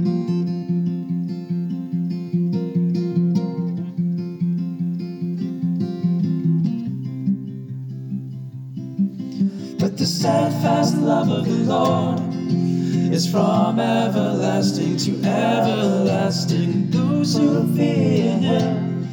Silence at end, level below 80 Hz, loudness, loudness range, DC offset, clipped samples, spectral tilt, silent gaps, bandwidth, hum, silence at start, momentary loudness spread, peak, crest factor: 0 s; -74 dBFS; -21 LUFS; 5 LU; under 0.1%; under 0.1%; -7 dB/octave; none; 17.5 kHz; none; 0 s; 8 LU; -6 dBFS; 14 dB